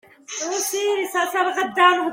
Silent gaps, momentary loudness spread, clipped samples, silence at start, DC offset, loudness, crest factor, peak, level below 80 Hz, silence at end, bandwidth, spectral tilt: none; 10 LU; under 0.1%; 0.3 s; under 0.1%; -20 LUFS; 18 dB; -2 dBFS; -72 dBFS; 0 s; 16.5 kHz; -0.5 dB/octave